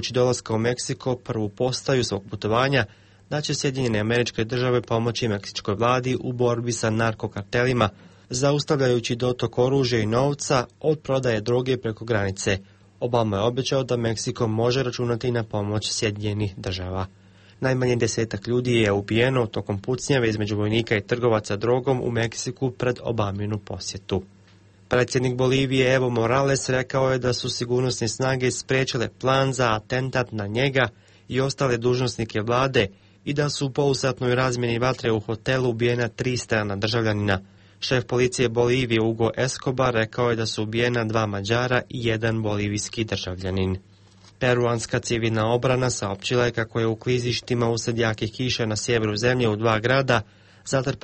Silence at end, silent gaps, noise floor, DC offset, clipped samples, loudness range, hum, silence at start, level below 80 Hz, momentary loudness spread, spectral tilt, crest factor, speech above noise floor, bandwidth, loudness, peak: 0.05 s; none; -53 dBFS; under 0.1%; under 0.1%; 3 LU; none; 0 s; -50 dBFS; 6 LU; -5 dB/octave; 16 dB; 30 dB; 8.8 kHz; -23 LUFS; -6 dBFS